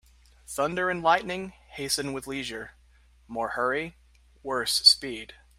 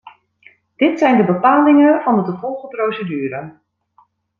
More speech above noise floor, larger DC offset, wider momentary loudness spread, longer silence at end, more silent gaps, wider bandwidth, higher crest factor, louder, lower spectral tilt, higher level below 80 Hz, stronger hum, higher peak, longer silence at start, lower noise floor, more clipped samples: second, 31 dB vs 42 dB; neither; first, 21 LU vs 15 LU; second, 0.25 s vs 0.9 s; neither; first, 16 kHz vs 6.6 kHz; first, 24 dB vs 14 dB; second, -25 LUFS vs -15 LUFS; second, -2 dB/octave vs -8 dB/octave; first, -58 dBFS vs -64 dBFS; neither; about the same, -4 dBFS vs -2 dBFS; first, 0.5 s vs 0.05 s; about the same, -58 dBFS vs -56 dBFS; neither